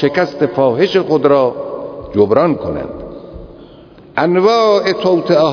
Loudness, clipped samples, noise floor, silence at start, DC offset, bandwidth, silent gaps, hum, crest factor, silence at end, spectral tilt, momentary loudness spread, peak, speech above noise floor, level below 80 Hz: -13 LUFS; under 0.1%; -39 dBFS; 0 s; under 0.1%; 5.4 kHz; none; none; 14 dB; 0 s; -6.5 dB/octave; 15 LU; 0 dBFS; 27 dB; -44 dBFS